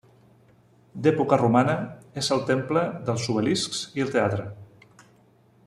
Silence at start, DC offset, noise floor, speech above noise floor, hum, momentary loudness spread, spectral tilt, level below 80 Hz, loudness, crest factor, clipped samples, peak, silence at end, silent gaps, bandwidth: 0.95 s; under 0.1%; -58 dBFS; 35 dB; none; 10 LU; -5.5 dB/octave; -62 dBFS; -24 LUFS; 22 dB; under 0.1%; -4 dBFS; 1 s; none; 13 kHz